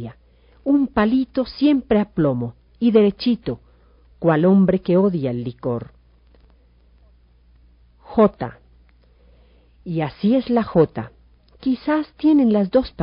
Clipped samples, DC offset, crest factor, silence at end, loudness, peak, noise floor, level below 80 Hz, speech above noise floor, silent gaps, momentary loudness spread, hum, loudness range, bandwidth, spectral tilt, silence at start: under 0.1%; under 0.1%; 18 dB; 0 s; -19 LUFS; -2 dBFS; -53 dBFS; -48 dBFS; 35 dB; none; 14 LU; none; 7 LU; 5.4 kHz; -7 dB/octave; 0 s